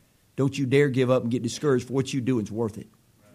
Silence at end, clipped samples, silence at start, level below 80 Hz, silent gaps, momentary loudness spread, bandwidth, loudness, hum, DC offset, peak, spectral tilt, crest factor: 0.5 s; under 0.1%; 0.35 s; -64 dBFS; none; 9 LU; 14.5 kHz; -25 LUFS; none; under 0.1%; -8 dBFS; -6.5 dB/octave; 18 dB